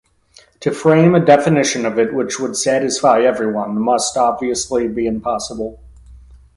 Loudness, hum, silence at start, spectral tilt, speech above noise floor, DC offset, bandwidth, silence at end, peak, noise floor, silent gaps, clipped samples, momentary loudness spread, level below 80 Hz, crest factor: -16 LUFS; none; 0.6 s; -5 dB/octave; 34 dB; under 0.1%; 11.5 kHz; 0.2 s; 0 dBFS; -50 dBFS; none; under 0.1%; 11 LU; -46 dBFS; 16 dB